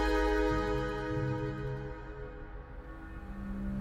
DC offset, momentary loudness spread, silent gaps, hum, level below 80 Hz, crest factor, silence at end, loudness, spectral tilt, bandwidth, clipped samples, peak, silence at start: under 0.1%; 18 LU; none; none; -40 dBFS; 16 dB; 0 s; -35 LUFS; -7 dB/octave; 14 kHz; under 0.1%; -18 dBFS; 0 s